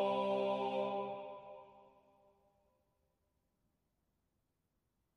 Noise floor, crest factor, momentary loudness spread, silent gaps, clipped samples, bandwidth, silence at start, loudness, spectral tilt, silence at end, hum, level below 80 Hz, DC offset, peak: -84 dBFS; 18 dB; 19 LU; none; under 0.1%; 10.5 kHz; 0 s; -38 LUFS; -6.5 dB/octave; 3.35 s; none; -84 dBFS; under 0.1%; -24 dBFS